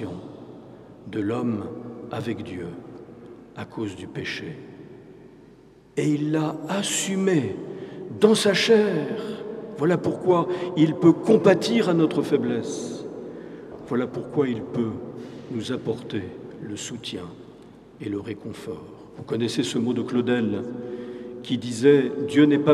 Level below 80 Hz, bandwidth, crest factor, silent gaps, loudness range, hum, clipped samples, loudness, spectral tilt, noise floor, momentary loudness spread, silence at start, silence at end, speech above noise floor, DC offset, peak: -64 dBFS; 13.5 kHz; 22 dB; none; 13 LU; none; under 0.1%; -24 LUFS; -5.5 dB/octave; -51 dBFS; 21 LU; 0 s; 0 s; 28 dB; under 0.1%; -2 dBFS